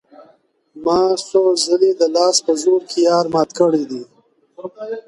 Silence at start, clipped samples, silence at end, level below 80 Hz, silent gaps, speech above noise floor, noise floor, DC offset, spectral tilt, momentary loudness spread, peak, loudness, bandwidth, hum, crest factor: 0.2 s; under 0.1%; 0.05 s; -60 dBFS; none; 39 dB; -55 dBFS; under 0.1%; -4 dB/octave; 14 LU; -2 dBFS; -16 LUFS; 11.5 kHz; none; 16 dB